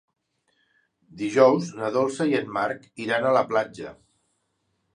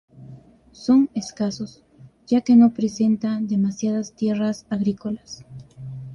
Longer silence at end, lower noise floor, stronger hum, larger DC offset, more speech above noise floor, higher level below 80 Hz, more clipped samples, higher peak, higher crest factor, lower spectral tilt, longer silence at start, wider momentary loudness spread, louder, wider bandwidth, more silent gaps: first, 1 s vs 0 s; first, -74 dBFS vs -44 dBFS; neither; neither; first, 50 dB vs 24 dB; second, -70 dBFS vs -58 dBFS; neither; first, -2 dBFS vs -6 dBFS; first, 24 dB vs 16 dB; about the same, -5.5 dB/octave vs -6.5 dB/octave; first, 1.15 s vs 0.2 s; second, 14 LU vs 20 LU; second, -24 LUFS vs -21 LUFS; first, 10.5 kHz vs 7.2 kHz; neither